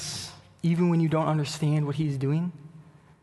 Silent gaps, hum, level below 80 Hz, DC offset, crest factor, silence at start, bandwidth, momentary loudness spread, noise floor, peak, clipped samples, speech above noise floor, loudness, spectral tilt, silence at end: none; none; -60 dBFS; under 0.1%; 14 dB; 0 s; 12 kHz; 12 LU; -52 dBFS; -14 dBFS; under 0.1%; 26 dB; -27 LUFS; -6.5 dB/octave; 0.4 s